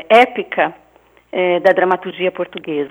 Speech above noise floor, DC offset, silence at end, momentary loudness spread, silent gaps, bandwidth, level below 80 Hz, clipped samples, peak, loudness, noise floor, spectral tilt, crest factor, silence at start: 23 dB; under 0.1%; 0 s; 11 LU; none; 13.5 kHz; -62 dBFS; under 0.1%; 0 dBFS; -16 LUFS; -39 dBFS; -5.5 dB/octave; 16 dB; 0.1 s